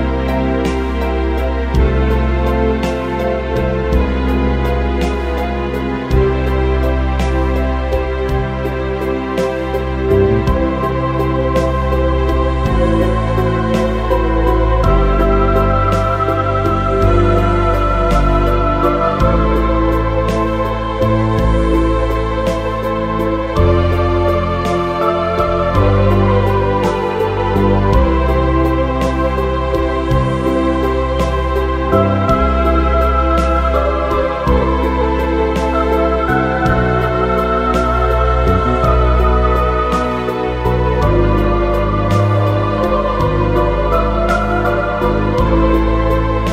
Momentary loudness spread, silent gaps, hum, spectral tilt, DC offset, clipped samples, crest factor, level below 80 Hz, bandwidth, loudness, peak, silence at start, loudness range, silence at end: 4 LU; none; none; -8 dB/octave; under 0.1%; under 0.1%; 12 dB; -18 dBFS; 14 kHz; -15 LUFS; -2 dBFS; 0 s; 3 LU; 0 s